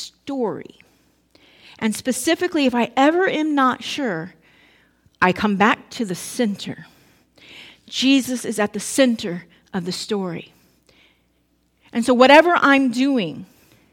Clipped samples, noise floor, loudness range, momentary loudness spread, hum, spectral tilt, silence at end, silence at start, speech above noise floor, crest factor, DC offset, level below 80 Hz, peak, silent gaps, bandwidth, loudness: under 0.1%; -64 dBFS; 6 LU; 15 LU; none; -4 dB/octave; 0.5 s; 0 s; 45 dB; 20 dB; under 0.1%; -60 dBFS; 0 dBFS; none; 17 kHz; -19 LUFS